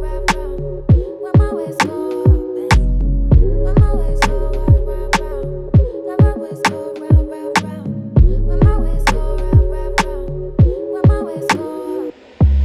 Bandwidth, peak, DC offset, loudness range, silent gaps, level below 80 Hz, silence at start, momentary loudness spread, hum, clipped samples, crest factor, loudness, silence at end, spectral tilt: 13 kHz; 0 dBFS; under 0.1%; 2 LU; none; -18 dBFS; 0 s; 9 LU; none; under 0.1%; 14 dB; -17 LUFS; 0 s; -6.5 dB/octave